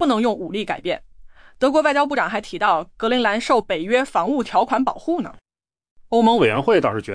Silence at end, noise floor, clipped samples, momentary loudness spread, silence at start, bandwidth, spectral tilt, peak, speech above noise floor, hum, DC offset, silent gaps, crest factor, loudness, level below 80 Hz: 0 s; -43 dBFS; under 0.1%; 9 LU; 0 s; 10.5 kHz; -5 dB/octave; -6 dBFS; 24 dB; none; under 0.1%; 5.91-5.96 s; 14 dB; -20 LUFS; -52 dBFS